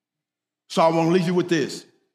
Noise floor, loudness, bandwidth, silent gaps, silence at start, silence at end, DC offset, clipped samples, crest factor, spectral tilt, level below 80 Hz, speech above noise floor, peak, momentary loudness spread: -87 dBFS; -21 LUFS; 14 kHz; none; 0.7 s; 0.35 s; under 0.1%; under 0.1%; 18 dB; -6 dB/octave; -72 dBFS; 67 dB; -6 dBFS; 11 LU